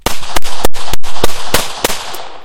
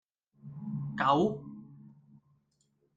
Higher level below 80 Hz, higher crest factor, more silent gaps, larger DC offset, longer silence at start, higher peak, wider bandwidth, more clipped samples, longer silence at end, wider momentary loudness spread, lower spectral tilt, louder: first, -26 dBFS vs -70 dBFS; second, 6 dB vs 22 dB; neither; neither; second, 0.05 s vs 0.45 s; first, 0 dBFS vs -14 dBFS; first, 17.5 kHz vs 7.6 kHz; first, 7% vs under 0.1%; second, 0 s vs 1.1 s; second, 8 LU vs 22 LU; second, -2.5 dB/octave vs -7 dB/octave; first, -18 LUFS vs -31 LUFS